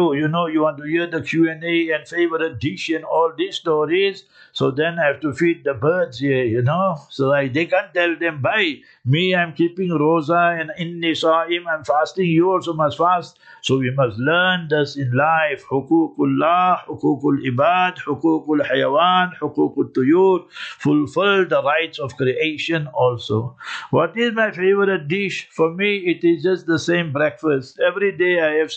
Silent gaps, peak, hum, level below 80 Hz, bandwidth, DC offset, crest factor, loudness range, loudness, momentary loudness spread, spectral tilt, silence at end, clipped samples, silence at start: none; -4 dBFS; none; -62 dBFS; 8.6 kHz; under 0.1%; 14 dB; 2 LU; -19 LUFS; 6 LU; -6.5 dB/octave; 0 s; under 0.1%; 0 s